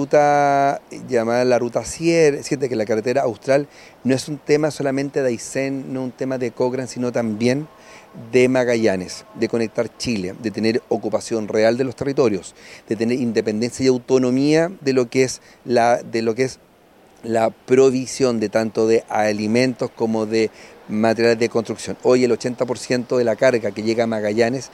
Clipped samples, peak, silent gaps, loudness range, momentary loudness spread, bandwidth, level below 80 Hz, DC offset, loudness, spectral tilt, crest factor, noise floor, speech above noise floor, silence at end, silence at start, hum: under 0.1%; -2 dBFS; none; 3 LU; 8 LU; 13 kHz; -58 dBFS; under 0.1%; -20 LUFS; -5.5 dB/octave; 16 dB; -51 dBFS; 32 dB; 0.05 s; 0 s; none